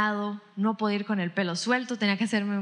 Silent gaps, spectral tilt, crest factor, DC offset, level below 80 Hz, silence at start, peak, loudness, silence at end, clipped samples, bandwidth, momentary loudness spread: none; -5 dB/octave; 18 dB; under 0.1%; under -90 dBFS; 0 s; -10 dBFS; -28 LUFS; 0 s; under 0.1%; 10.5 kHz; 4 LU